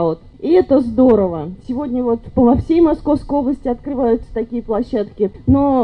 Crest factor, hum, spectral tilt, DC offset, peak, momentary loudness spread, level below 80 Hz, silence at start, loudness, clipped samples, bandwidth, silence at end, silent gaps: 12 dB; none; -10 dB/octave; under 0.1%; -2 dBFS; 10 LU; -36 dBFS; 0 s; -16 LUFS; under 0.1%; 5.4 kHz; 0 s; none